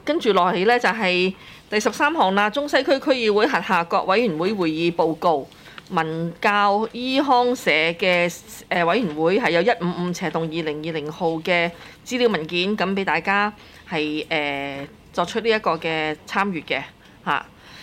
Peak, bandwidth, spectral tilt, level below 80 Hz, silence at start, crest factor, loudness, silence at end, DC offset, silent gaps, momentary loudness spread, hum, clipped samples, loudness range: -6 dBFS; 16 kHz; -5 dB/octave; -58 dBFS; 0.05 s; 16 dB; -21 LUFS; 0 s; under 0.1%; none; 8 LU; none; under 0.1%; 4 LU